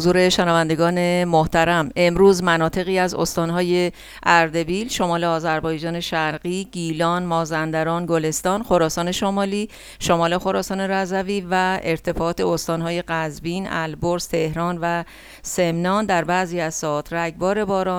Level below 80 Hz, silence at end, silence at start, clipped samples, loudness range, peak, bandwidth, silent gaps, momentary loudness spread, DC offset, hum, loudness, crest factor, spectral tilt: -44 dBFS; 0 s; 0 s; under 0.1%; 5 LU; 0 dBFS; 17.5 kHz; none; 8 LU; under 0.1%; none; -20 LUFS; 20 dB; -5 dB/octave